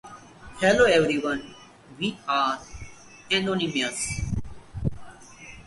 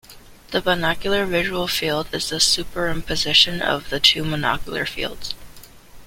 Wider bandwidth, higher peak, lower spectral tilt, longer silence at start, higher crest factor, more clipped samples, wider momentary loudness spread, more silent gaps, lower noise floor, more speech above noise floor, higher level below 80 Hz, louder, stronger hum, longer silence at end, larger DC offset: second, 11.5 kHz vs 16.5 kHz; second, -6 dBFS vs 0 dBFS; first, -4 dB/octave vs -2.5 dB/octave; about the same, 0.05 s vs 0.1 s; about the same, 20 dB vs 22 dB; neither; first, 26 LU vs 11 LU; neither; about the same, -45 dBFS vs -42 dBFS; about the same, 22 dB vs 21 dB; about the same, -44 dBFS vs -40 dBFS; second, -25 LUFS vs -20 LUFS; neither; about the same, 0.05 s vs 0 s; neither